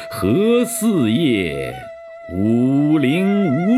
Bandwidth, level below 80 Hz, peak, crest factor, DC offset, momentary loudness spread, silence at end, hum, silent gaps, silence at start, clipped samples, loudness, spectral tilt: 15 kHz; -50 dBFS; -6 dBFS; 12 dB; under 0.1%; 13 LU; 0 s; none; none; 0 s; under 0.1%; -17 LUFS; -6 dB/octave